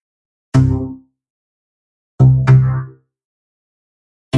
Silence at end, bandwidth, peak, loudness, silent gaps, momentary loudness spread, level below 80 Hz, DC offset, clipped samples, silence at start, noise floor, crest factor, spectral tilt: 0 s; 7 kHz; 0 dBFS; -14 LUFS; 1.30-2.18 s, 3.25-4.31 s; 15 LU; -36 dBFS; under 0.1%; under 0.1%; 0.55 s; under -90 dBFS; 16 dB; -8.5 dB/octave